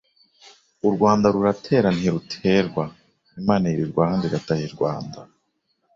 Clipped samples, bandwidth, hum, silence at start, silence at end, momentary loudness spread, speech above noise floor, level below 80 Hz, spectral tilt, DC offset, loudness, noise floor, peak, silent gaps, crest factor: under 0.1%; 7.6 kHz; none; 0.85 s; 0.7 s; 10 LU; 50 dB; -52 dBFS; -7 dB/octave; under 0.1%; -22 LUFS; -71 dBFS; -4 dBFS; none; 18 dB